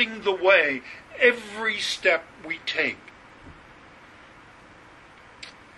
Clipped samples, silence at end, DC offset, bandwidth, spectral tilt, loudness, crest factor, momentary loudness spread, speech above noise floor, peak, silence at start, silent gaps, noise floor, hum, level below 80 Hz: under 0.1%; 0.25 s; under 0.1%; 11.5 kHz; -2.5 dB/octave; -23 LUFS; 22 dB; 22 LU; 26 dB; -4 dBFS; 0 s; none; -49 dBFS; none; -62 dBFS